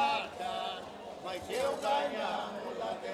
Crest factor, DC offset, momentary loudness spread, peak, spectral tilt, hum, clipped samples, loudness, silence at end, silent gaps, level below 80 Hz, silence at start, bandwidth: 16 dB; under 0.1%; 10 LU; -18 dBFS; -3 dB/octave; none; under 0.1%; -36 LUFS; 0 s; none; -70 dBFS; 0 s; 15.5 kHz